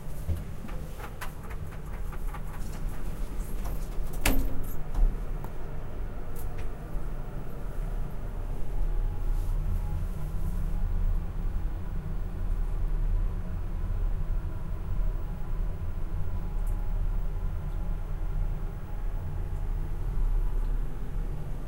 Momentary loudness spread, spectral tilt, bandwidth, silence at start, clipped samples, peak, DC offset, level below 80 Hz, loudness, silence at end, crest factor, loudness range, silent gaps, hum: 7 LU; -6 dB/octave; 16 kHz; 0 s; under 0.1%; -6 dBFS; under 0.1%; -30 dBFS; -36 LUFS; 0 s; 22 dB; 4 LU; none; none